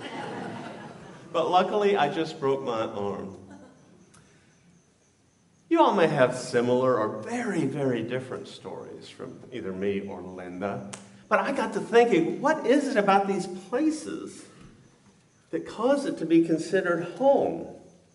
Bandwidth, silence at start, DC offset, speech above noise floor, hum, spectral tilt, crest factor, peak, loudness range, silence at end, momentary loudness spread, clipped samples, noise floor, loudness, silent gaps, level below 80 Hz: 11.5 kHz; 0 s; under 0.1%; 38 dB; none; -5.5 dB/octave; 22 dB; -6 dBFS; 8 LU; 0.25 s; 18 LU; under 0.1%; -63 dBFS; -26 LUFS; none; -70 dBFS